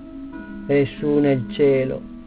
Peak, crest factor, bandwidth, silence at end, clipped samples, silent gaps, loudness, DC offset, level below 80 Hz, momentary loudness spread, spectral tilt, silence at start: -8 dBFS; 14 dB; 4 kHz; 0 s; under 0.1%; none; -20 LUFS; under 0.1%; -46 dBFS; 17 LU; -11.5 dB/octave; 0 s